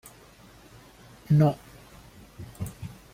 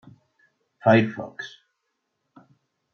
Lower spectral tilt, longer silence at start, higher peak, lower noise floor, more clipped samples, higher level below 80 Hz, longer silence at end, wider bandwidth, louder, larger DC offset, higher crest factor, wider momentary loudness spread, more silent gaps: about the same, -8.5 dB/octave vs -7.5 dB/octave; first, 1.3 s vs 0.85 s; second, -10 dBFS vs -4 dBFS; second, -52 dBFS vs -78 dBFS; neither; first, -56 dBFS vs -72 dBFS; second, 0.2 s vs 1.45 s; first, 15.5 kHz vs 6.6 kHz; second, -26 LUFS vs -21 LUFS; neither; about the same, 20 dB vs 22 dB; first, 28 LU vs 20 LU; neither